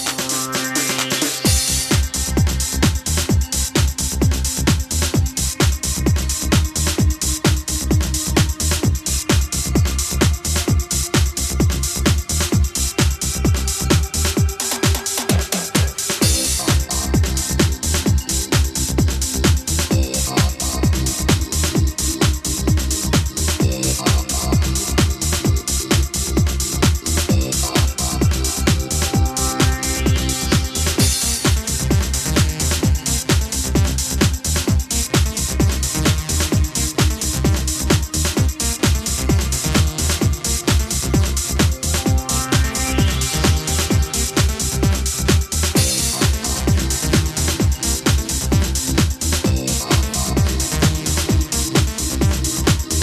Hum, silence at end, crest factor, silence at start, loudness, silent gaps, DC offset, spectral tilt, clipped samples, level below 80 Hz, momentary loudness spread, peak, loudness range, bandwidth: none; 0 s; 18 dB; 0 s; -18 LUFS; none; under 0.1%; -4 dB/octave; under 0.1%; -22 dBFS; 2 LU; 0 dBFS; 1 LU; 14 kHz